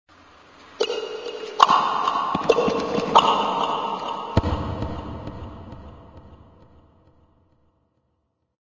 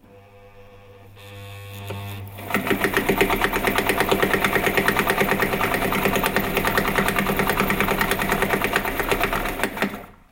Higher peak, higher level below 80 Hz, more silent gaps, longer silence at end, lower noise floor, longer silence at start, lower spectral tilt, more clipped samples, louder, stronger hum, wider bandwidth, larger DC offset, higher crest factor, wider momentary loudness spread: about the same, 0 dBFS vs -2 dBFS; about the same, -42 dBFS vs -38 dBFS; neither; first, 2.3 s vs 0.2 s; first, -72 dBFS vs -47 dBFS; first, 0.6 s vs 0.1 s; about the same, -5 dB/octave vs -4 dB/octave; neither; about the same, -22 LUFS vs -21 LUFS; neither; second, 7.6 kHz vs 17 kHz; neither; about the same, 24 dB vs 20 dB; first, 21 LU vs 15 LU